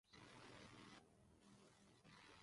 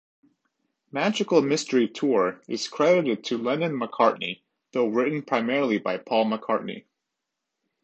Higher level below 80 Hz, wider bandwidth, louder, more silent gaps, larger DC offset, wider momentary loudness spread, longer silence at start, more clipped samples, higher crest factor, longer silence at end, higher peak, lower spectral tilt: second, -82 dBFS vs -76 dBFS; first, 11.5 kHz vs 8.8 kHz; second, -64 LUFS vs -25 LUFS; neither; neither; about the same, 8 LU vs 10 LU; second, 0.05 s vs 0.95 s; neither; about the same, 16 dB vs 20 dB; second, 0 s vs 1.05 s; second, -50 dBFS vs -6 dBFS; about the same, -4 dB/octave vs -5 dB/octave